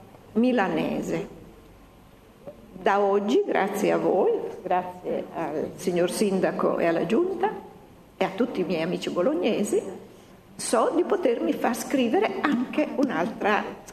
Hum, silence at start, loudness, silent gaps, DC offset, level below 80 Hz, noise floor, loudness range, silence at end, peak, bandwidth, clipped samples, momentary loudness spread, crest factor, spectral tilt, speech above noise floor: none; 0 s; -25 LUFS; none; under 0.1%; -60 dBFS; -51 dBFS; 2 LU; 0 s; -4 dBFS; 13.5 kHz; under 0.1%; 8 LU; 22 dB; -5 dB/octave; 27 dB